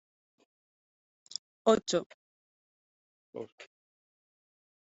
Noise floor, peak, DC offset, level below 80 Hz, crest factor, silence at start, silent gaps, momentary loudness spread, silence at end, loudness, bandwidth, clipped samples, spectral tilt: under -90 dBFS; -10 dBFS; under 0.1%; -76 dBFS; 26 dB; 1.65 s; 2.06-3.33 s, 3.52-3.58 s; 21 LU; 1.3 s; -31 LUFS; 8 kHz; under 0.1%; -4 dB/octave